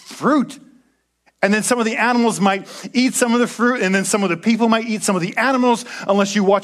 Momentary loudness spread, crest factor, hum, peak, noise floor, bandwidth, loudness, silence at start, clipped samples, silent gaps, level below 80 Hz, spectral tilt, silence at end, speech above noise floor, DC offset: 4 LU; 18 dB; none; 0 dBFS; -61 dBFS; 14.5 kHz; -17 LUFS; 0.05 s; under 0.1%; none; -66 dBFS; -4 dB/octave; 0 s; 44 dB; under 0.1%